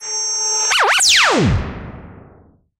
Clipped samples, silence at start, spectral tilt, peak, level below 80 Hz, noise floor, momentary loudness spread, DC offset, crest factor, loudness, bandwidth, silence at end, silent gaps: under 0.1%; 0 s; -2 dB/octave; -2 dBFS; -34 dBFS; -49 dBFS; 20 LU; under 0.1%; 16 dB; -13 LUFS; 16 kHz; 0.65 s; none